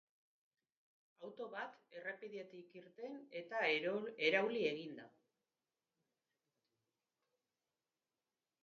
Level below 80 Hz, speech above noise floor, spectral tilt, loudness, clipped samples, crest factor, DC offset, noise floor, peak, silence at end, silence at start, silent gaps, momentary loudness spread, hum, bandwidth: under -90 dBFS; over 48 dB; -1.5 dB/octave; -41 LUFS; under 0.1%; 26 dB; under 0.1%; under -90 dBFS; -20 dBFS; 3.55 s; 1.2 s; none; 20 LU; none; 7.2 kHz